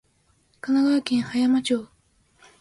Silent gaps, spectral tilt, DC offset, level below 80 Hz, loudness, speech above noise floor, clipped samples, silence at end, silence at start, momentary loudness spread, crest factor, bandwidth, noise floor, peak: none; -4.5 dB/octave; under 0.1%; -64 dBFS; -23 LUFS; 43 dB; under 0.1%; 0.75 s; 0.65 s; 7 LU; 18 dB; 11.5 kHz; -64 dBFS; -6 dBFS